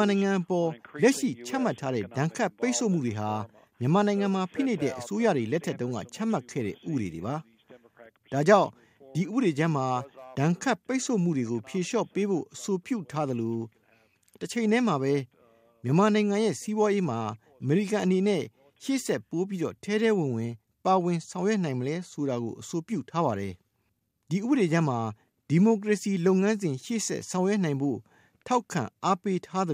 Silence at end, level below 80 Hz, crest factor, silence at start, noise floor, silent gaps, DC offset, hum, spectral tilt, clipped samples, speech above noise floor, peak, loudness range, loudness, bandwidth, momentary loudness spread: 0 s; -72 dBFS; 22 dB; 0 s; -75 dBFS; none; under 0.1%; none; -6 dB/octave; under 0.1%; 48 dB; -6 dBFS; 4 LU; -28 LUFS; 15.5 kHz; 10 LU